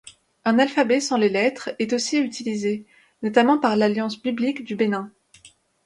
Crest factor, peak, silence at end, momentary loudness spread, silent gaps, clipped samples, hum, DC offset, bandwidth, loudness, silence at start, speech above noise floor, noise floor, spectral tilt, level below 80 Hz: 18 dB; -4 dBFS; 0.4 s; 9 LU; none; under 0.1%; none; under 0.1%; 11.5 kHz; -22 LUFS; 0.05 s; 32 dB; -53 dBFS; -4.5 dB/octave; -68 dBFS